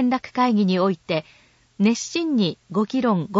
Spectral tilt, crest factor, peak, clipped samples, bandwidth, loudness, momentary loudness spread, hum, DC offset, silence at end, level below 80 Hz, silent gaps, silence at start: -5.5 dB/octave; 14 dB; -8 dBFS; under 0.1%; 8 kHz; -22 LUFS; 6 LU; none; under 0.1%; 0 s; -64 dBFS; none; 0 s